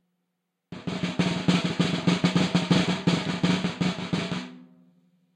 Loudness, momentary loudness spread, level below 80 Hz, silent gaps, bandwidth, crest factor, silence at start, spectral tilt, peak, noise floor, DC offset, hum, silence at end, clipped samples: -25 LUFS; 12 LU; -60 dBFS; none; 10 kHz; 18 dB; 0.7 s; -5.5 dB/octave; -8 dBFS; -80 dBFS; under 0.1%; none; 0.7 s; under 0.1%